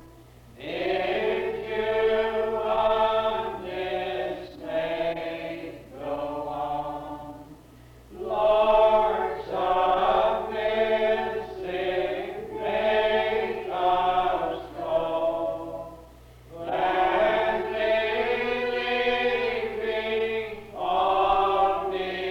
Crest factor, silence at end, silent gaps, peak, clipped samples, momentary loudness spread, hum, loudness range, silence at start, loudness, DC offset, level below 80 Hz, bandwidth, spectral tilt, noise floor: 16 dB; 0 s; none; -10 dBFS; under 0.1%; 13 LU; none; 7 LU; 0 s; -26 LUFS; under 0.1%; -50 dBFS; 15.5 kHz; -5.5 dB/octave; -50 dBFS